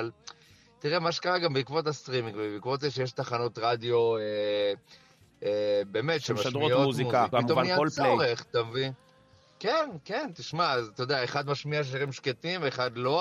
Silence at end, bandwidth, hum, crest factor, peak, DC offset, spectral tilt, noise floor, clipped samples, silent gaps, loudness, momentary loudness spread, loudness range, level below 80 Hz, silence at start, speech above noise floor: 0 s; 13 kHz; none; 18 dB; -12 dBFS; under 0.1%; -5 dB/octave; -60 dBFS; under 0.1%; none; -29 LUFS; 9 LU; 4 LU; -72 dBFS; 0 s; 32 dB